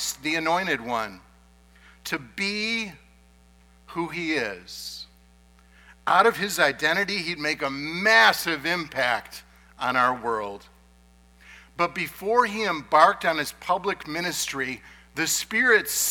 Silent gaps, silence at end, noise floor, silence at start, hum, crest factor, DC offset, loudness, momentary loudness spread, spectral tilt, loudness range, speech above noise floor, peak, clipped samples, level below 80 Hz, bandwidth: none; 0 s; -55 dBFS; 0 s; none; 24 dB; under 0.1%; -23 LUFS; 17 LU; -2 dB/octave; 9 LU; 31 dB; -2 dBFS; under 0.1%; -58 dBFS; 19 kHz